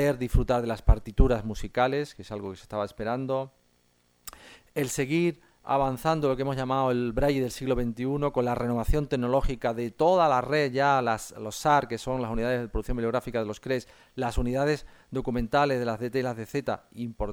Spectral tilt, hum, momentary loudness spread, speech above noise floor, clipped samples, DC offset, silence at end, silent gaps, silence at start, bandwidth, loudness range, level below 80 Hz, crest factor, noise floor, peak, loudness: -6 dB/octave; none; 10 LU; 40 dB; under 0.1%; under 0.1%; 0 s; none; 0 s; 20 kHz; 6 LU; -34 dBFS; 22 dB; -67 dBFS; -6 dBFS; -28 LUFS